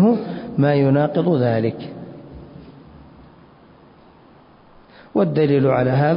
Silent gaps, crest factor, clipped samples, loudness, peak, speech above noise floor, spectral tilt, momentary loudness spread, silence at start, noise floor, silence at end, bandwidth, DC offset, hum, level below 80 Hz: none; 14 dB; under 0.1%; -18 LUFS; -6 dBFS; 32 dB; -13 dB/octave; 22 LU; 0 s; -48 dBFS; 0 s; 5.4 kHz; under 0.1%; none; -54 dBFS